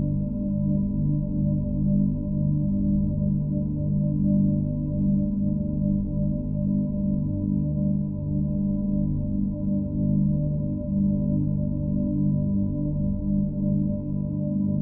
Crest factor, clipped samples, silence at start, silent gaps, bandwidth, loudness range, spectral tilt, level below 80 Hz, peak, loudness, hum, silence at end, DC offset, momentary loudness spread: 12 dB; under 0.1%; 0 s; none; 1.1 kHz; 2 LU; -18 dB/octave; -36 dBFS; -12 dBFS; -25 LUFS; 50 Hz at -30 dBFS; 0 s; under 0.1%; 4 LU